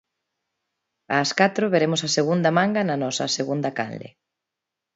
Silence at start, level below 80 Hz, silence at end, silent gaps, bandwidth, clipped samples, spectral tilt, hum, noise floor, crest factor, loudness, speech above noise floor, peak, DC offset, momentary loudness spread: 1.1 s; -70 dBFS; 0.85 s; none; 8 kHz; under 0.1%; -4.5 dB/octave; none; -85 dBFS; 20 dB; -22 LUFS; 63 dB; -4 dBFS; under 0.1%; 8 LU